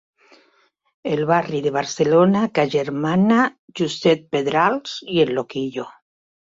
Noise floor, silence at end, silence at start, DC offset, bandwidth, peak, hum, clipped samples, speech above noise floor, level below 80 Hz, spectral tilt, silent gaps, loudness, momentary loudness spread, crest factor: -62 dBFS; 0.65 s; 1.05 s; under 0.1%; 7.8 kHz; -4 dBFS; none; under 0.1%; 43 dB; -62 dBFS; -6 dB/octave; 3.59-3.68 s; -20 LUFS; 11 LU; 16 dB